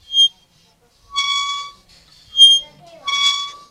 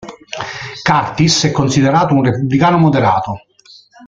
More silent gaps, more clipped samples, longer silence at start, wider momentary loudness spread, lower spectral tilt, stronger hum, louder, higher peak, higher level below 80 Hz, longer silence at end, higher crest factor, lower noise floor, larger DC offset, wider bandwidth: neither; neither; about the same, 0.1 s vs 0 s; first, 18 LU vs 14 LU; second, 3.5 dB/octave vs -5 dB/octave; neither; about the same, -13 LUFS vs -13 LUFS; about the same, 0 dBFS vs 0 dBFS; second, -60 dBFS vs -44 dBFS; first, 0.15 s vs 0 s; about the same, 18 dB vs 14 dB; first, -56 dBFS vs -44 dBFS; neither; first, 16 kHz vs 9.2 kHz